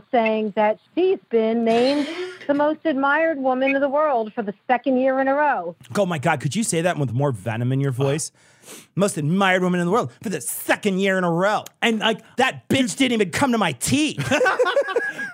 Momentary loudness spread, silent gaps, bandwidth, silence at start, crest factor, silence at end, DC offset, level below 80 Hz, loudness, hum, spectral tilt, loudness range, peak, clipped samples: 5 LU; none; 16 kHz; 0.15 s; 16 dB; 0 s; under 0.1%; -60 dBFS; -21 LUFS; none; -5 dB/octave; 2 LU; -4 dBFS; under 0.1%